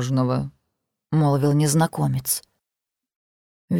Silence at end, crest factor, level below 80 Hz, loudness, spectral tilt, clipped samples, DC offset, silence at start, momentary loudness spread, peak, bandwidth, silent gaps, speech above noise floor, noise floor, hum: 0 s; 16 dB; -56 dBFS; -22 LUFS; -6 dB/octave; under 0.1%; under 0.1%; 0 s; 7 LU; -8 dBFS; 17.5 kHz; 3.16-3.68 s; 66 dB; -86 dBFS; none